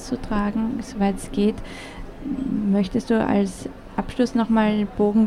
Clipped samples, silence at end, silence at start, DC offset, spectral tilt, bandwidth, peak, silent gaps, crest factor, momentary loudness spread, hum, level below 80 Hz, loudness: under 0.1%; 0 s; 0 s; under 0.1%; -7 dB/octave; 12 kHz; -6 dBFS; none; 16 dB; 15 LU; none; -40 dBFS; -23 LUFS